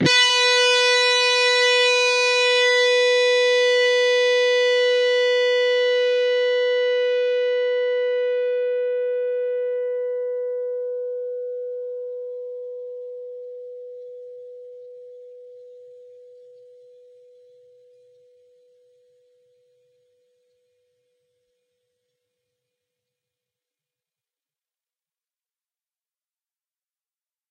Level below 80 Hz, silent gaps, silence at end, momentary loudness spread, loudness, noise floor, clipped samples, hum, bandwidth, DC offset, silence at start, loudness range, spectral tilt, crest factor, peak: -74 dBFS; none; 11.45 s; 20 LU; -19 LUFS; under -90 dBFS; under 0.1%; none; 11 kHz; under 0.1%; 0 s; 21 LU; -1.5 dB/octave; 20 dB; -2 dBFS